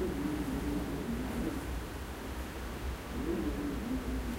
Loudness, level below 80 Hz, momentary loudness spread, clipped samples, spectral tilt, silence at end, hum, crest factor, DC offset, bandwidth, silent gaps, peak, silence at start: -37 LUFS; -42 dBFS; 6 LU; under 0.1%; -6 dB/octave; 0 s; none; 14 dB; under 0.1%; 16 kHz; none; -22 dBFS; 0 s